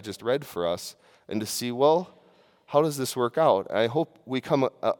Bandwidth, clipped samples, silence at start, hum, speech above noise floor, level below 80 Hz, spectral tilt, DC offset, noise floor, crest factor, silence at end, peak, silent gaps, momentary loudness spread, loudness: 18 kHz; under 0.1%; 0 s; none; 33 dB; -72 dBFS; -5 dB/octave; under 0.1%; -59 dBFS; 20 dB; 0.05 s; -6 dBFS; none; 10 LU; -26 LUFS